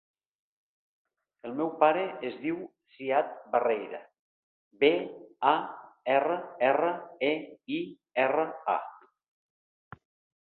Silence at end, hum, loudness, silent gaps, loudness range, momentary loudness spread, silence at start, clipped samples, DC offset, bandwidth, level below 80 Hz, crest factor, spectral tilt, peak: 1.45 s; none; -29 LUFS; 4.19-4.71 s; 4 LU; 14 LU; 1.45 s; under 0.1%; under 0.1%; 4.4 kHz; -78 dBFS; 24 dB; -8.5 dB/octave; -6 dBFS